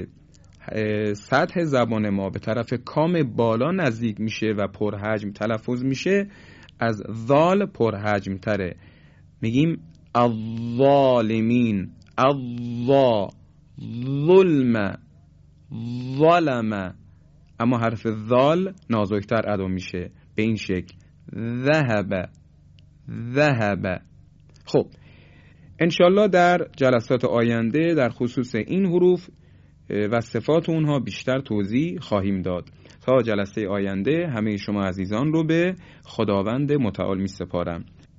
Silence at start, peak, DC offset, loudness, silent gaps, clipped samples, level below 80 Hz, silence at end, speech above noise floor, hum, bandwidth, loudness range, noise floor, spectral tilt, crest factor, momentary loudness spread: 0 s; -4 dBFS; under 0.1%; -22 LUFS; none; under 0.1%; -50 dBFS; 0.35 s; 30 dB; none; 7.8 kHz; 4 LU; -52 dBFS; -7.5 dB/octave; 18 dB; 12 LU